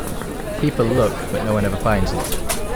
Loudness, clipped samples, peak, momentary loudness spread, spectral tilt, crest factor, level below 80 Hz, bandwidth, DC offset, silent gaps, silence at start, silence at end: -21 LUFS; under 0.1%; -4 dBFS; 8 LU; -5.5 dB/octave; 14 dB; -30 dBFS; over 20 kHz; under 0.1%; none; 0 s; 0 s